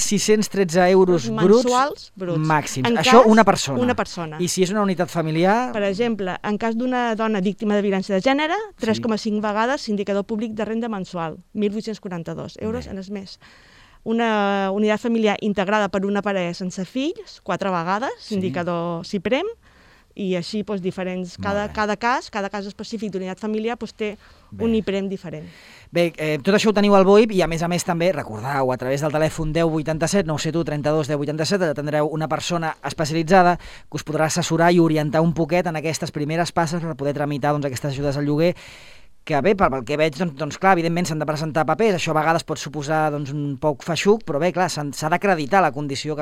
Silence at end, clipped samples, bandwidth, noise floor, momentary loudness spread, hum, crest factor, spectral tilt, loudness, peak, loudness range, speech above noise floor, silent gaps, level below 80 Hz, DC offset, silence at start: 0 s; under 0.1%; 15.5 kHz; -52 dBFS; 12 LU; none; 20 dB; -5.5 dB/octave; -21 LUFS; 0 dBFS; 8 LU; 31 dB; none; -48 dBFS; under 0.1%; 0 s